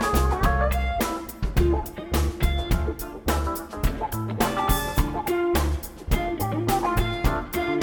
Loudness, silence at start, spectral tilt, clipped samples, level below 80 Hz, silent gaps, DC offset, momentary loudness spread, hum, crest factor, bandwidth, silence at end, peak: -25 LUFS; 0 s; -5.5 dB/octave; under 0.1%; -28 dBFS; none; under 0.1%; 6 LU; none; 18 dB; 19 kHz; 0 s; -6 dBFS